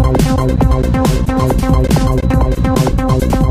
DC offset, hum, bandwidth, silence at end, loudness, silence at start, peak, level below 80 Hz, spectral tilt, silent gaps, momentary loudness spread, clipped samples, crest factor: under 0.1%; none; 16 kHz; 0 s; -13 LUFS; 0 s; 0 dBFS; -16 dBFS; -7 dB/octave; none; 2 LU; under 0.1%; 12 dB